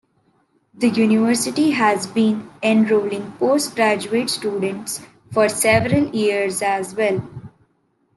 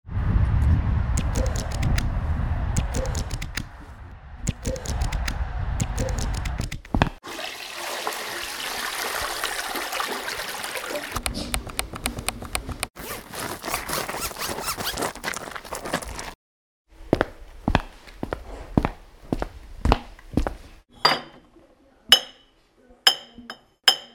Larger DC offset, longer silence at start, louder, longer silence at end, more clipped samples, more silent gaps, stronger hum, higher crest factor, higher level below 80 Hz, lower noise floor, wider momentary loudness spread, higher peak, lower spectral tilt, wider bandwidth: neither; first, 0.75 s vs 0.05 s; first, -19 LUFS vs -26 LUFS; first, 0.7 s vs 0.05 s; neither; second, none vs 12.90-12.94 s, 16.35-16.85 s; neither; second, 16 dB vs 26 dB; second, -56 dBFS vs -32 dBFS; first, -64 dBFS vs -58 dBFS; second, 9 LU vs 13 LU; second, -4 dBFS vs 0 dBFS; about the same, -4.5 dB/octave vs -3.5 dB/octave; second, 12.5 kHz vs over 20 kHz